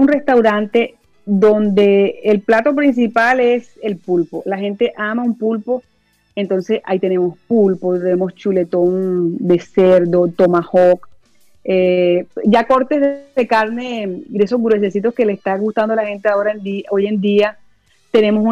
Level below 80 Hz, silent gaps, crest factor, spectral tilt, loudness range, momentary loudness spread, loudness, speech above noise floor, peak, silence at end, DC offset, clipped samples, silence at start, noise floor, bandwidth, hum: -58 dBFS; none; 12 dB; -7.5 dB/octave; 4 LU; 8 LU; -15 LUFS; 37 dB; -4 dBFS; 0 s; under 0.1%; under 0.1%; 0 s; -52 dBFS; 8.2 kHz; none